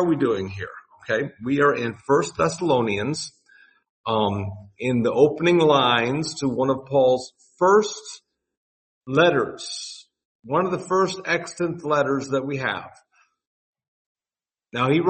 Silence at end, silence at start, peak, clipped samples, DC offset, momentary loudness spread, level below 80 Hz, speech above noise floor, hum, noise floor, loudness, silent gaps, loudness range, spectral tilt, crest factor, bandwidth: 0 s; 0 s; -4 dBFS; under 0.1%; under 0.1%; 16 LU; -60 dBFS; over 68 dB; none; under -90 dBFS; -22 LUFS; 3.89-4.04 s, 8.57-9.01 s, 10.25-10.39 s, 13.47-13.73 s, 13.88-14.15 s; 5 LU; -5 dB/octave; 20 dB; 8.8 kHz